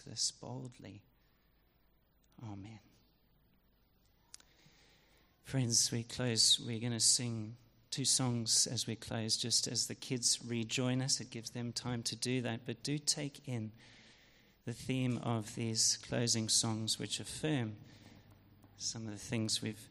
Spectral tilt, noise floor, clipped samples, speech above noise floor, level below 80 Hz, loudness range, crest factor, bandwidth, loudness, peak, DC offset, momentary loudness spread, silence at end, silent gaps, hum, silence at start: -3 dB/octave; -72 dBFS; under 0.1%; 35 dB; -70 dBFS; 8 LU; 22 dB; 15.5 kHz; -34 LUFS; -16 dBFS; under 0.1%; 17 LU; 0 s; none; none; 0 s